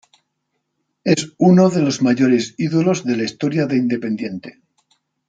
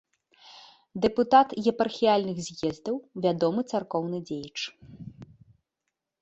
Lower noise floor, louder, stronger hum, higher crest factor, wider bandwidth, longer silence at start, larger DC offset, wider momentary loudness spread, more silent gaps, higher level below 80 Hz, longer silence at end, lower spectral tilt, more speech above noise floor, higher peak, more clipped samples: second, -73 dBFS vs -84 dBFS; first, -17 LUFS vs -27 LUFS; neither; second, 16 dB vs 22 dB; first, 9.2 kHz vs 8.2 kHz; first, 1.05 s vs 0.45 s; neither; second, 11 LU vs 19 LU; neither; about the same, -62 dBFS vs -62 dBFS; second, 0.8 s vs 0.95 s; about the same, -6 dB/octave vs -5.5 dB/octave; about the same, 57 dB vs 58 dB; first, -2 dBFS vs -6 dBFS; neither